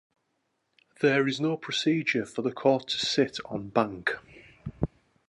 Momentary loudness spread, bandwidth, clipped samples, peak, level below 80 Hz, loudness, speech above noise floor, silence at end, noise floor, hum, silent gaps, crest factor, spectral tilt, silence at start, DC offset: 10 LU; 11.5 kHz; under 0.1%; -8 dBFS; -54 dBFS; -28 LUFS; 50 dB; 0.4 s; -77 dBFS; none; none; 22 dB; -5 dB/octave; 1 s; under 0.1%